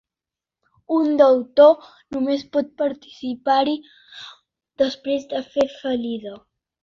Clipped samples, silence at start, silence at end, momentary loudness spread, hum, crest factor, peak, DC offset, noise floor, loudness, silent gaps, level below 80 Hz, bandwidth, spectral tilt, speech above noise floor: under 0.1%; 0.9 s; 0.45 s; 17 LU; none; 18 dB; -2 dBFS; under 0.1%; -89 dBFS; -20 LUFS; none; -64 dBFS; 7.2 kHz; -5 dB/octave; 69 dB